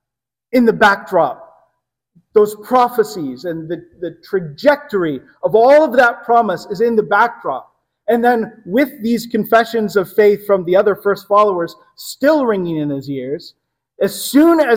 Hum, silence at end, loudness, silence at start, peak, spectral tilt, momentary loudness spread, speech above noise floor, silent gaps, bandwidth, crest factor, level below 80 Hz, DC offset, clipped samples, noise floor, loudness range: none; 0 s; -15 LUFS; 0.55 s; 0 dBFS; -5.5 dB/octave; 14 LU; 70 dB; none; 17 kHz; 14 dB; -58 dBFS; under 0.1%; under 0.1%; -84 dBFS; 4 LU